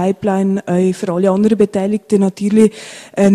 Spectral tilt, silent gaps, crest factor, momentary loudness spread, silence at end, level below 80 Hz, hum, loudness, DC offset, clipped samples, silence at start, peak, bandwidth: -7.5 dB/octave; none; 14 dB; 4 LU; 0 s; -54 dBFS; none; -15 LUFS; under 0.1%; under 0.1%; 0 s; 0 dBFS; 11.5 kHz